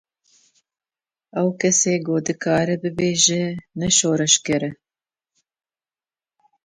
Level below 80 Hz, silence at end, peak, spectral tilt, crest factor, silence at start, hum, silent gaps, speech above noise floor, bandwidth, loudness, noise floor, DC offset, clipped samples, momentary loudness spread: -56 dBFS; 1.9 s; 0 dBFS; -3 dB/octave; 22 dB; 1.35 s; none; none; over 70 dB; 10.5 kHz; -19 LUFS; under -90 dBFS; under 0.1%; under 0.1%; 9 LU